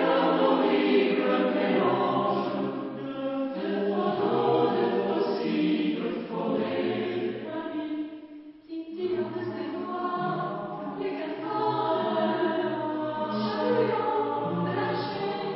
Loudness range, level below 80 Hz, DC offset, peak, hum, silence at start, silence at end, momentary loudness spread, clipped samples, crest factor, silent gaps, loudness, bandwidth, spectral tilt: 7 LU; -72 dBFS; under 0.1%; -10 dBFS; none; 0 s; 0 s; 10 LU; under 0.1%; 16 dB; none; -28 LUFS; 5.8 kHz; -10.5 dB/octave